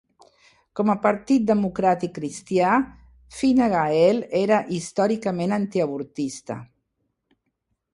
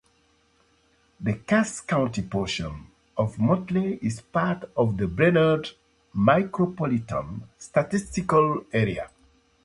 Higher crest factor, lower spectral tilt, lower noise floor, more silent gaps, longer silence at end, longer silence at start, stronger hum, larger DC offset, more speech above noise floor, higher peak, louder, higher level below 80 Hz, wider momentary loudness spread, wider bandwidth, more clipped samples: about the same, 18 dB vs 20 dB; about the same, -6 dB/octave vs -6.5 dB/octave; first, -76 dBFS vs -64 dBFS; neither; first, 1.3 s vs 0.55 s; second, 0.75 s vs 1.2 s; neither; neither; first, 54 dB vs 40 dB; about the same, -6 dBFS vs -4 dBFS; first, -22 LUFS vs -25 LUFS; second, -58 dBFS vs -50 dBFS; about the same, 13 LU vs 14 LU; about the same, 11.5 kHz vs 11.5 kHz; neither